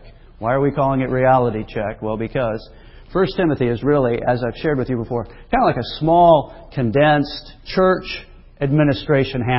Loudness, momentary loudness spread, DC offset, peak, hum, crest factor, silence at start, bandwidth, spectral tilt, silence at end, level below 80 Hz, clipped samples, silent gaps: -18 LUFS; 11 LU; under 0.1%; -2 dBFS; none; 16 dB; 0.05 s; 5.8 kHz; -11.5 dB/octave; 0 s; -40 dBFS; under 0.1%; none